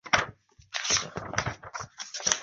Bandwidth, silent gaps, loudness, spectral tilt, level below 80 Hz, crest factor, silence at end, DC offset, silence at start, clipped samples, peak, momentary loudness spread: 8.4 kHz; none; -30 LUFS; -1 dB/octave; -54 dBFS; 30 dB; 0 s; under 0.1%; 0.05 s; under 0.1%; -2 dBFS; 13 LU